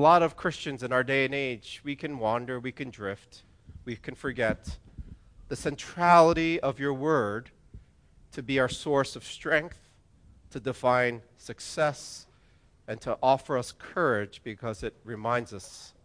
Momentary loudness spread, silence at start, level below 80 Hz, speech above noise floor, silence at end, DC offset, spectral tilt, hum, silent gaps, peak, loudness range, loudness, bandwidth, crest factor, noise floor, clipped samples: 18 LU; 0 s; -54 dBFS; 33 dB; 0.15 s; under 0.1%; -5 dB/octave; none; none; -6 dBFS; 8 LU; -28 LUFS; 10.5 kHz; 22 dB; -61 dBFS; under 0.1%